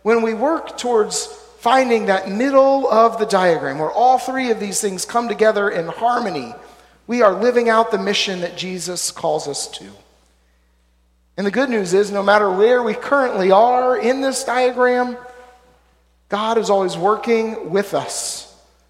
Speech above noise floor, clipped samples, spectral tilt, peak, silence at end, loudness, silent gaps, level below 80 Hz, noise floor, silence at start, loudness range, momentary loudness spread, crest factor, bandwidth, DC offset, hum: 41 dB; under 0.1%; -3.5 dB/octave; 0 dBFS; 0.45 s; -17 LUFS; none; -58 dBFS; -58 dBFS; 0.05 s; 6 LU; 11 LU; 18 dB; 15.5 kHz; under 0.1%; none